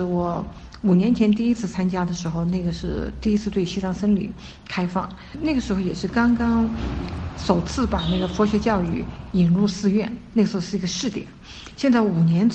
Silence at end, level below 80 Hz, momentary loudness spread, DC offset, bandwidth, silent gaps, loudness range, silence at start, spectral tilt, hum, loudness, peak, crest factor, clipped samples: 0 s; -38 dBFS; 10 LU; under 0.1%; 8.4 kHz; none; 3 LU; 0 s; -6.5 dB/octave; none; -22 LUFS; -2 dBFS; 18 dB; under 0.1%